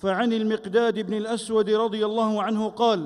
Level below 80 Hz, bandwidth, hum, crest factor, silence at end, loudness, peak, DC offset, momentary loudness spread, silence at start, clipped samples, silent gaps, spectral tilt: -64 dBFS; 11.5 kHz; none; 14 dB; 0 s; -24 LUFS; -8 dBFS; under 0.1%; 4 LU; 0.05 s; under 0.1%; none; -5.5 dB/octave